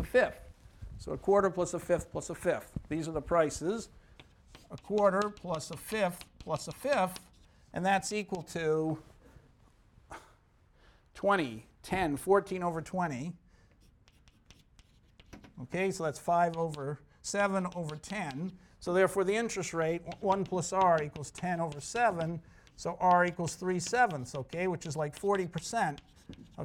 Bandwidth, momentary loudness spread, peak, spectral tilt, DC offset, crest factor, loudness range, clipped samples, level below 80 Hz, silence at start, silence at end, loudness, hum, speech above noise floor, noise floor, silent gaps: 18 kHz; 16 LU; -14 dBFS; -5 dB/octave; under 0.1%; 20 dB; 5 LU; under 0.1%; -58 dBFS; 0 s; 0 s; -32 LUFS; none; 33 dB; -64 dBFS; none